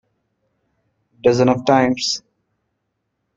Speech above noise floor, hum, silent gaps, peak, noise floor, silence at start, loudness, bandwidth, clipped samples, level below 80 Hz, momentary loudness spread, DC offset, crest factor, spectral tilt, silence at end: 58 dB; none; none; -2 dBFS; -74 dBFS; 1.25 s; -17 LUFS; 8.8 kHz; under 0.1%; -56 dBFS; 7 LU; under 0.1%; 20 dB; -5 dB/octave; 1.2 s